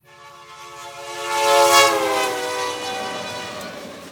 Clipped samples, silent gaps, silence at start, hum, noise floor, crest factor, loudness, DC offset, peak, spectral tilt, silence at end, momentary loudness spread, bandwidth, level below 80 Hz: under 0.1%; none; 0.2 s; none; -44 dBFS; 22 dB; -18 LUFS; under 0.1%; 0 dBFS; -1 dB/octave; 0 s; 22 LU; over 20 kHz; -64 dBFS